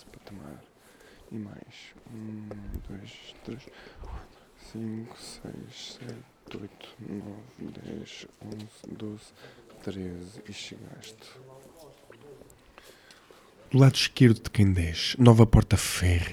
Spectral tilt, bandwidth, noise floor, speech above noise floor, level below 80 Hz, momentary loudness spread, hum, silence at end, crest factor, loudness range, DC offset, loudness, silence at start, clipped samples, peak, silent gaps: -6 dB/octave; 14.5 kHz; -55 dBFS; 28 dB; -42 dBFS; 26 LU; none; 0 s; 24 dB; 21 LU; under 0.1%; -23 LUFS; 0.3 s; under 0.1%; -4 dBFS; none